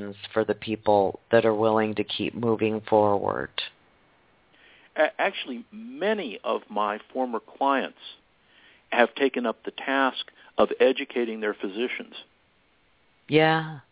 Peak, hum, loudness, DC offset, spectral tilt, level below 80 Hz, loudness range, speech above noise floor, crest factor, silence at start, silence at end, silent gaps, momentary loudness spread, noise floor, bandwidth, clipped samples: -4 dBFS; none; -26 LUFS; under 0.1%; -9 dB/octave; -64 dBFS; 5 LU; 39 dB; 22 dB; 0 s; 0.1 s; none; 13 LU; -65 dBFS; 4 kHz; under 0.1%